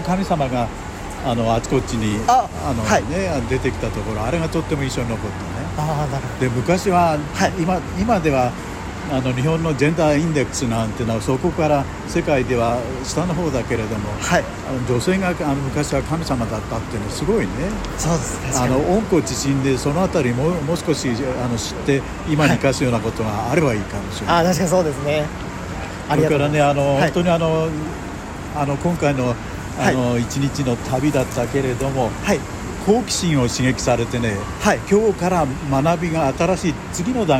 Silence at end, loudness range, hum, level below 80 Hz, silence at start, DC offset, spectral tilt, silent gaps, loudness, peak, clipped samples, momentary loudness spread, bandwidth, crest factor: 0 s; 3 LU; none; -36 dBFS; 0 s; under 0.1%; -5.5 dB/octave; none; -20 LUFS; -4 dBFS; under 0.1%; 8 LU; 16 kHz; 16 dB